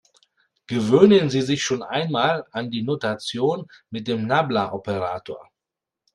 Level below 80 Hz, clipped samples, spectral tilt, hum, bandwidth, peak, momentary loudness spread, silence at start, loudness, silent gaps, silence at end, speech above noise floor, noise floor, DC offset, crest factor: -62 dBFS; under 0.1%; -5.5 dB/octave; none; 11 kHz; 0 dBFS; 16 LU; 0.7 s; -22 LUFS; none; 0.75 s; 65 dB; -87 dBFS; under 0.1%; 22 dB